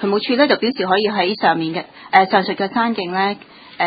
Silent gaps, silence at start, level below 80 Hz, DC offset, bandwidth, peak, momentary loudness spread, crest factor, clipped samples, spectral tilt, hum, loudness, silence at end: none; 0 s; -62 dBFS; under 0.1%; 5 kHz; 0 dBFS; 7 LU; 18 dB; under 0.1%; -8.5 dB/octave; none; -17 LUFS; 0 s